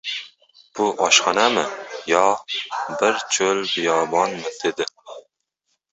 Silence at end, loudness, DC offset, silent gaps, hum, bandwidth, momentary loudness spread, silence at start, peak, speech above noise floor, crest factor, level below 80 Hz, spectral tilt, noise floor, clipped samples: 0.7 s; -20 LUFS; under 0.1%; none; none; 8.4 kHz; 13 LU; 0.05 s; -2 dBFS; 54 dB; 20 dB; -66 dBFS; -1.5 dB/octave; -74 dBFS; under 0.1%